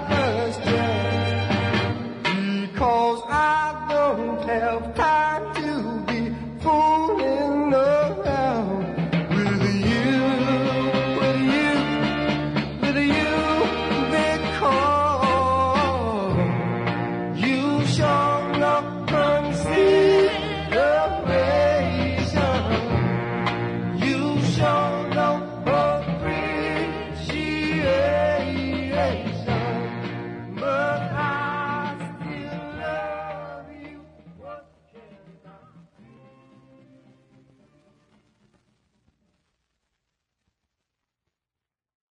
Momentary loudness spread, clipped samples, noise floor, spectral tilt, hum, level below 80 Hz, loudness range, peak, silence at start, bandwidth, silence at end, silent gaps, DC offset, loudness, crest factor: 9 LU; under 0.1%; -90 dBFS; -6.5 dB/octave; none; -48 dBFS; 7 LU; -8 dBFS; 0 s; 10.5 kHz; 6.35 s; none; under 0.1%; -22 LUFS; 16 dB